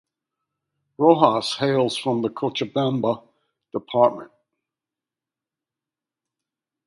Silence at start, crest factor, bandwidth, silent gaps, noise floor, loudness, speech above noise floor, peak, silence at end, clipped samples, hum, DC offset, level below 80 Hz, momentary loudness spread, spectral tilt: 1 s; 24 dB; 11.5 kHz; none; -89 dBFS; -21 LUFS; 68 dB; 0 dBFS; 2.6 s; under 0.1%; none; under 0.1%; -68 dBFS; 13 LU; -6 dB/octave